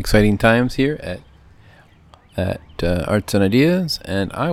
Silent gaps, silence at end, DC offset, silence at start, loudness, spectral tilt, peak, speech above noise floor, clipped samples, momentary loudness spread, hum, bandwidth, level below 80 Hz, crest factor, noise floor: none; 0 s; under 0.1%; 0 s; -18 LUFS; -6 dB/octave; 0 dBFS; 31 dB; under 0.1%; 12 LU; none; 16 kHz; -34 dBFS; 18 dB; -49 dBFS